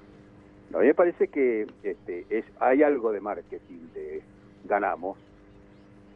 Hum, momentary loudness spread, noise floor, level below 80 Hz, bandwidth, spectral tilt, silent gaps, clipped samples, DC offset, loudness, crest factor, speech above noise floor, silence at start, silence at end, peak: none; 19 LU; -52 dBFS; -62 dBFS; 3.9 kHz; -9 dB/octave; none; under 0.1%; under 0.1%; -26 LUFS; 20 dB; 26 dB; 0.7 s; 1 s; -8 dBFS